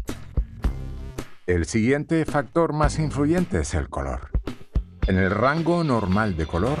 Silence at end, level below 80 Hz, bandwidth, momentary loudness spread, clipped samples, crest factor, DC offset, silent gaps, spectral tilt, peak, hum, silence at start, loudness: 0 s; -32 dBFS; 14 kHz; 10 LU; under 0.1%; 18 dB; under 0.1%; none; -6.5 dB/octave; -6 dBFS; none; 0 s; -24 LUFS